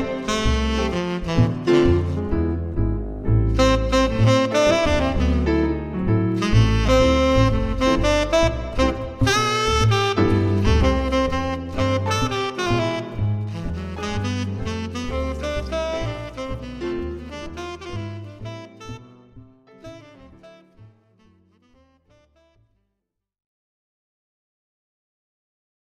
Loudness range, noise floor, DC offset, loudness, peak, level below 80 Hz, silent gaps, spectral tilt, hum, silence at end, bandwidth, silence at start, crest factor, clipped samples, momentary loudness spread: 14 LU; -80 dBFS; under 0.1%; -21 LUFS; -4 dBFS; -30 dBFS; none; -6 dB/octave; none; 5.05 s; 13.5 kHz; 0 s; 18 dB; under 0.1%; 14 LU